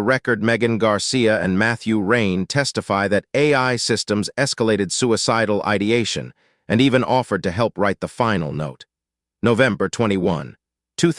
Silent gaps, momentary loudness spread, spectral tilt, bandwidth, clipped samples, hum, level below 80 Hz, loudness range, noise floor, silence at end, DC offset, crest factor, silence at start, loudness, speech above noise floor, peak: none; 6 LU; -5 dB/octave; 12 kHz; under 0.1%; none; -54 dBFS; 2 LU; -86 dBFS; 0 s; under 0.1%; 18 dB; 0 s; -19 LUFS; 67 dB; -2 dBFS